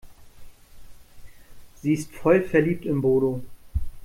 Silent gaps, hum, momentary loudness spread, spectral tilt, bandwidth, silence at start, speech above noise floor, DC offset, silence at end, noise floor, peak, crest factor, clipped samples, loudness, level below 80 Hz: none; none; 14 LU; -7.5 dB/octave; 16 kHz; 0.05 s; 21 dB; under 0.1%; 0 s; -43 dBFS; -6 dBFS; 20 dB; under 0.1%; -24 LUFS; -40 dBFS